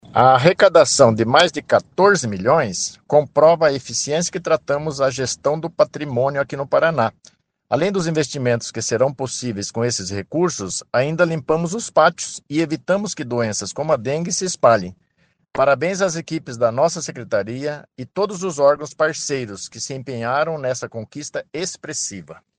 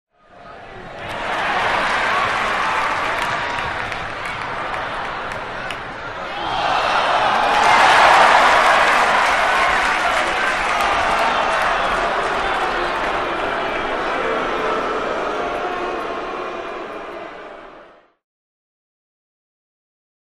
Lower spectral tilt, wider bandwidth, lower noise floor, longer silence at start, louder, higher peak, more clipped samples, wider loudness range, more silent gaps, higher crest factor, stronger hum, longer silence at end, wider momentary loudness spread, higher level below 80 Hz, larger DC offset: first, -4 dB/octave vs -2.5 dB/octave; second, 10 kHz vs 14.5 kHz; first, -64 dBFS vs -45 dBFS; second, 0.1 s vs 0.35 s; about the same, -19 LUFS vs -18 LUFS; about the same, 0 dBFS vs 0 dBFS; neither; second, 6 LU vs 13 LU; neither; about the same, 20 dB vs 20 dB; neither; second, 0.25 s vs 2.4 s; second, 13 LU vs 16 LU; second, -58 dBFS vs -42 dBFS; neither